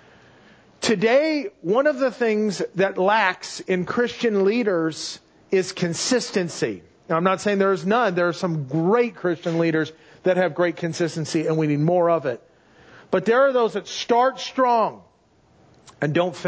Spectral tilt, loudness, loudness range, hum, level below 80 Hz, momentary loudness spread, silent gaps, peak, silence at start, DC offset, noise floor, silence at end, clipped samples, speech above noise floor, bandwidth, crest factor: -5 dB/octave; -22 LUFS; 2 LU; none; -66 dBFS; 8 LU; none; -6 dBFS; 0.8 s; under 0.1%; -58 dBFS; 0 s; under 0.1%; 37 dB; 8 kHz; 16 dB